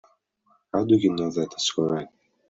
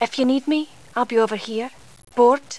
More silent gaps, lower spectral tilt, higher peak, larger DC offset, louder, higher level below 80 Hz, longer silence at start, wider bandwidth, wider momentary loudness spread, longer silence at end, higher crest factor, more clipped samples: neither; about the same, -5 dB/octave vs -4 dB/octave; about the same, -6 dBFS vs -4 dBFS; second, under 0.1% vs 0.4%; second, -24 LUFS vs -21 LUFS; about the same, -64 dBFS vs -66 dBFS; first, 0.75 s vs 0 s; second, 7.8 kHz vs 11 kHz; about the same, 10 LU vs 12 LU; first, 0.4 s vs 0 s; about the same, 18 dB vs 16 dB; neither